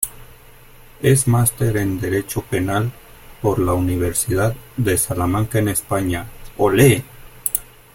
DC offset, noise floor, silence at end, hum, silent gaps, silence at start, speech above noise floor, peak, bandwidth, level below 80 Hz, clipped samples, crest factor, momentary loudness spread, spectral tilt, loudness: under 0.1%; -44 dBFS; 0.3 s; none; none; 0 s; 26 dB; 0 dBFS; 17 kHz; -40 dBFS; under 0.1%; 20 dB; 9 LU; -5.5 dB/octave; -19 LUFS